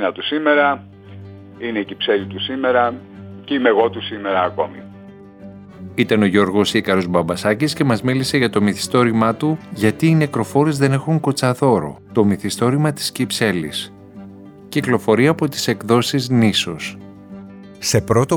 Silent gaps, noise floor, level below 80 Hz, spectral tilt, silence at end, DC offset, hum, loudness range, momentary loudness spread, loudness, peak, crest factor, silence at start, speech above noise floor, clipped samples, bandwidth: none; -39 dBFS; -54 dBFS; -5.5 dB/octave; 0 s; under 0.1%; none; 3 LU; 19 LU; -18 LUFS; -2 dBFS; 16 dB; 0 s; 22 dB; under 0.1%; 19.5 kHz